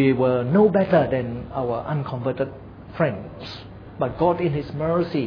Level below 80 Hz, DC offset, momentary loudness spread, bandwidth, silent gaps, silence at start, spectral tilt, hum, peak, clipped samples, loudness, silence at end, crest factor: -48 dBFS; under 0.1%; 18 LU; 5.4 kHz; none; 0 s; -9.5 dB/octave; none; -6 dBFS; under 0.1%; -22 LUFS; 0 s; 16 dB